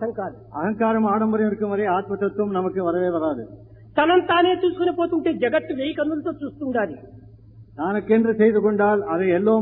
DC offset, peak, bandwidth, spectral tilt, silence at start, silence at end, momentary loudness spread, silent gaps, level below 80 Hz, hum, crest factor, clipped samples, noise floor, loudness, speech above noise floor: under 0.1%; -6 dBFS; 4.1 kHz; -10.5 dB/octave; 0 s; 0 s; 11 LU; none; -56 dBFS; none; 16 dB; under 0.1%; -46 dBFS; -21 LUFS; 25 dB